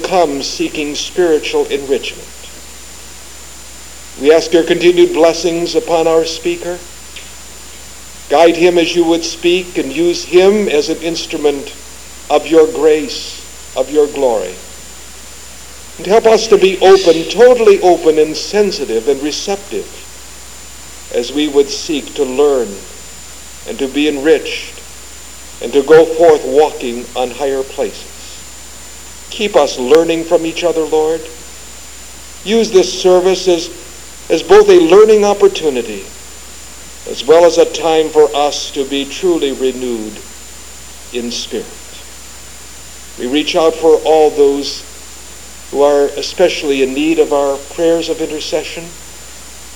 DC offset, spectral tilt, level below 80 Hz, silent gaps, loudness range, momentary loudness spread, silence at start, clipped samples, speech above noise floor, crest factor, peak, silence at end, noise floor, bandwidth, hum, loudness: 2%; -3.5 dB/octave; -42 dBFS; none; 8 LU; 22 LU; 0 s; 0.5%; 22 dB; 14 dB; 0 dBFS; 0 s; -33 dBFS; 20 kHz; none; -12 LUFS